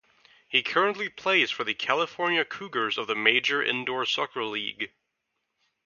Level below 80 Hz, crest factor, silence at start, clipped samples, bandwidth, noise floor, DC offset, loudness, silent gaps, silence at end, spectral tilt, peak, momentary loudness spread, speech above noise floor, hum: -76 dBFS; 26 dB; 0.5 s; under 0.1%; 7.2 kHz; -80 dBFS; under 0.1%; -26 LUFS; none; 1 s; -3 dB/octave; -2 dBFS; 8 LU; 53 dB; none